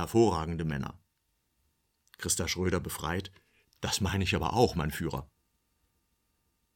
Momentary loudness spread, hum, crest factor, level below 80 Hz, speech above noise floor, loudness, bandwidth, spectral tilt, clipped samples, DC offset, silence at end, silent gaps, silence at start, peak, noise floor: 12 LU; none; 22 dB; -50 dBFS; 47 dB; -31 LUFS; 17.5 kHz; -4.5 dB/octave; under 0.1%; under 0.1%; 1.5 s; none; 0 s; -10 dBFS; -77 dBFS